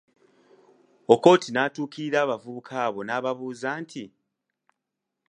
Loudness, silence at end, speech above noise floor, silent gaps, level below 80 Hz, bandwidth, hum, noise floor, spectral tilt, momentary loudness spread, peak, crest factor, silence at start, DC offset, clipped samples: -24 LUFS; 1.2 s; 60 dB; none; -76 dBFS; 10 kHz; none; -84 dBFS; -5 dB/octave; 17 LU; -2 dBFS; 24 dB; 1.1 s; under 0.1%; under 0.1%